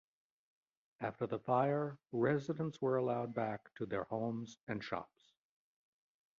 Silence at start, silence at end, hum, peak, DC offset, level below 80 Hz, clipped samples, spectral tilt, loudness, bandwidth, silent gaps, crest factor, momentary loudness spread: 1 s; 1.35 s; none; -20 dBFS; under 0.1%; -76 dBFS; under 0.1%; -6.5 dB/octave; -39 LUFS; 7.4 kHz; 4.63-4.67 s; 20 dB; 10 LU